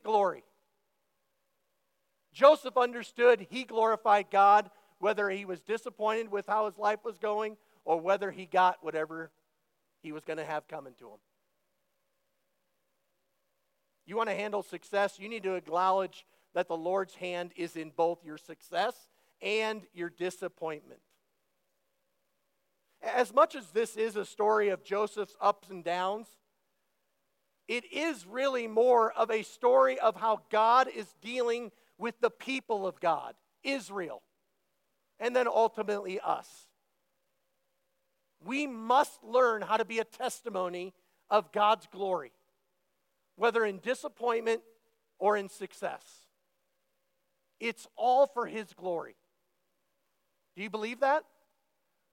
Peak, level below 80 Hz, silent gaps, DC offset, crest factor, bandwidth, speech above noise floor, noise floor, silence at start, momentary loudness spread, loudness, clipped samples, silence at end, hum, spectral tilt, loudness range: -8 dBFS; under -90 dBFS; none; under 0.1%; 24 dB; 16.5 kHz; 50 dB; -80 dBFS; 0.05 s; 14 LU; -30 LUFS; under 0.1%; 0.9 s; none; -4 dB/octave; 10 LU